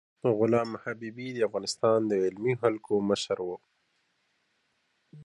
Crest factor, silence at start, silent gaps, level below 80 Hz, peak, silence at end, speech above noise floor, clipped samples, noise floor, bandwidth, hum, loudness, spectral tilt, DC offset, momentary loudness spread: 20 dB; 0.25 s; none; -70 dBFS; -10 dBFS; 0 s; 46 dB; under 0.1%; -74 dBFS; 11.5 kHz; none; -29 LUFS; -5.5 dB/octave; under 0.1%; 12 LU